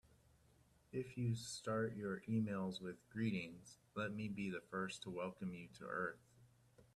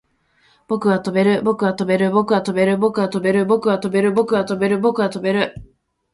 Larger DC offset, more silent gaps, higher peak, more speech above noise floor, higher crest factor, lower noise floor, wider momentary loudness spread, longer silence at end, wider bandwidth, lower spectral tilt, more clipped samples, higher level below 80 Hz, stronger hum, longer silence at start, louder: neither; neither; second, -30 dBFS vs -2 dBFS; second, 28 dB vs 42 dB; about the same, 16 dB vs 16 dB; first, -72 dBFS vs -59 dBFS; first, 8 LU vs 3 LU; second, 0.15 s vs 0.5 s; first, 13.5 kHz vs 11.5 kHz; about the same, -6 dB/octave vs -7 dB/octave; neither; second, -76 dBFS vs -54 dBFS; neither; first, 0.95 s vs 0.7 s; second, -45 LUFS vs -18 LUFS